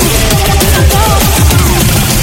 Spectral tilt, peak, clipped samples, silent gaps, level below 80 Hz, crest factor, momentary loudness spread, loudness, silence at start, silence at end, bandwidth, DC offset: -4 dB/octave; 0 dBFS; 1%; none; -12 dBFS; 8 dB; 1 LU; -8 LUFS; 0 s; 0 s; over 20 kHz; under 0.1%